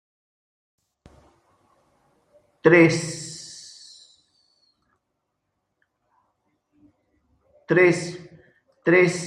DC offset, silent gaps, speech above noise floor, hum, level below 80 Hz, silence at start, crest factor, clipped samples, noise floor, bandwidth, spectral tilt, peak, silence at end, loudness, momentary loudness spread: under 0.1%; none; 60 dB; none; -66 dBFS; 2.65 s; 24 dB; under 0.1%; -78 dBFS; 10.5 kHz; -5.5 dB/octave; -2 dBFS; 0 s; -19 LUFS; 25 LU